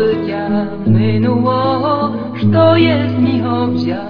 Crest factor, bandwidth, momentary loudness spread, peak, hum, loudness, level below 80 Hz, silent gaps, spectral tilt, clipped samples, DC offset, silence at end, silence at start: 14 dB; 5.2 kHz; 7 LU; 0 dBFS; none; -14 LUFS; -46 dBFS; none; -10 dB/octave; under 0.1%; under 0.1%; 0 s; 0 s